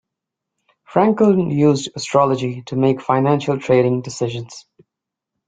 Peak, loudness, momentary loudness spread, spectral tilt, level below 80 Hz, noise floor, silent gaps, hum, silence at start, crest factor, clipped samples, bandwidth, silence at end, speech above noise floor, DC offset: -2 dBFS; -17 LUFS; 9 LU; -6.5 dB/octave; -58 dBFS; -84 dBFS; none; none; 0.9 s; 16 dB; under 0.1%; 9.4 kHz; 0.9 s; 67 dB; under 0.1%